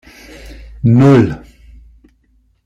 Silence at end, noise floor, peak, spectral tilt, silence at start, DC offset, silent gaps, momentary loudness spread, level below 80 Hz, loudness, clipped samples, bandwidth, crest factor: 1.3 s; -56 dBFS; -2 dBFS; -9 dB/octave; 0.45 s; under 0.1%; none; 23 LU; -38 dBFS; -11 LUFS; under 0.1%; 8.2 kHz; 14 dB